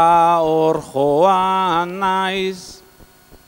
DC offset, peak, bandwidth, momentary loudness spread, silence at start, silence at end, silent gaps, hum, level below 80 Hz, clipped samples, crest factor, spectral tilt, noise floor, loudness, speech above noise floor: under 0.1%; -2 dBFS; 16.5 kHz; 10 LU; 0 s; 0.7 s; none; none; -52 dBFS; under 0.1%; 16 dB; -5.5 dB/octave; -47 dBFS; -16 LUFS; 30 dB